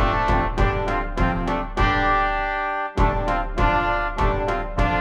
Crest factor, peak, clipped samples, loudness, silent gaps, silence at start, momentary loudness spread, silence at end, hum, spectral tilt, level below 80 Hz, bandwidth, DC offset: 16 dB; -4 dBFS; under 0.1%; -22 LUFS; none; 0 s; 5 LU; 0 s; none; -6.5 dB/octave; -26 dBFS; 8.4 kHz; under 0.1%